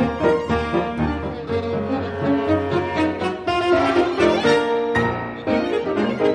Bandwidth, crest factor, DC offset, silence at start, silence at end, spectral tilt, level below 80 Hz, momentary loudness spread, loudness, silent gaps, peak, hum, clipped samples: 11 kHz; 16 dB; under 0.1%; 0 s; 0 s; -6.5 dB/octave; -44 dBFS; 7 LU; -20 LUFS; none; -4 dBFS; none; under 0.1%